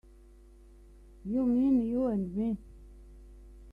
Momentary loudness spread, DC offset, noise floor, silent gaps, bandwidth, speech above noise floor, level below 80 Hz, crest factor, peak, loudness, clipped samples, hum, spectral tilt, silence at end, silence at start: 11 LU; under 0.1%; -55 dBFS; none; 3.3 kHz; 26 dB; -52 dBFS; 14 dB; -18 dBFS; -30 LUFS; under 0.1%; none; -10 dB/octave; 0 s; 1.25 s